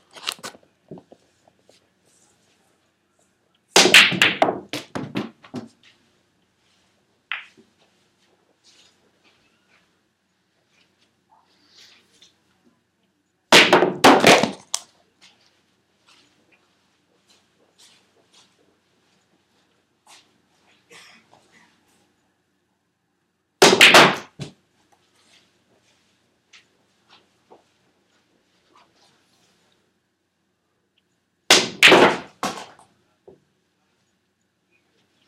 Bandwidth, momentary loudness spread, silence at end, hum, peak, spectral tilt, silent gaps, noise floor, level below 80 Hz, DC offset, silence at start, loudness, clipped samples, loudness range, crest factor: 16 kHz; 27 LU; 2.65 s; none; 0 dBFS; -2 dB/octave; none; -71 dBFS; -68 dBFS; under 0.1%; 0.25 s; -14 LUFS; under 0.1%; 23 LU; 24 dB